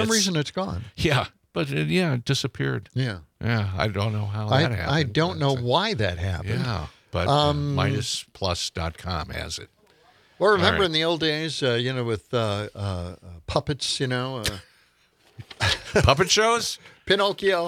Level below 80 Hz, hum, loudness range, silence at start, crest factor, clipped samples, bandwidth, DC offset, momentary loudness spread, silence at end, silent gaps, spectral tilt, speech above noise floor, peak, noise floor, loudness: -46 dBFS; none; 4 LU; 0 s; 24 dB; under 0.1%; 16 kHz; under 0.1%; 11 LU; 0 s; none; -4.5 dB/octave; 38 dB; -2 dBFS; -62 dBFS; -24 LUFS